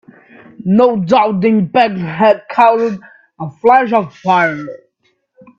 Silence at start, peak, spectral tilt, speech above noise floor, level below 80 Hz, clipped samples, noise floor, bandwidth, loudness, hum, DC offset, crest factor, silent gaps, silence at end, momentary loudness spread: 0.6 s; 0 dBFS; -7.5 dB/octave; 50 dB; -58 dBFS; under 0.1%; -62 dBFS; 7.2 kHz; -12 LUFS; none; under 0.1%; 14 dB; none; 0.85 s; 15 LU